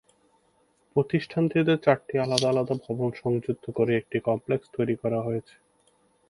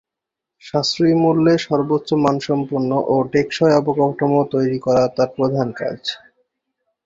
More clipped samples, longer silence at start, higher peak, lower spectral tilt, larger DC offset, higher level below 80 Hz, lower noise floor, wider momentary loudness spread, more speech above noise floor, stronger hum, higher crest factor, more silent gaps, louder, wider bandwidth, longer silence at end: neither; first, 0.95 s vs 0.65 s; about the same, -2 dBFS vs -2 dBFS; about the same, -6 dB/octave vs -6.5 dB/octave; neither; second, -64 dBFS vs -56 dBFS; second, -66 dBFS vs -84 dBFS; about the same, 7 LU vs 9 LU; second, 41 dB vs 67 dB; neither; first, 24 dB vs 16 dB; neither; second, -26 LUFS vs -18 LUFS; first, 11.5 kHz vs 7.8 kHz; about the same, 0.9 s vs 0.9 s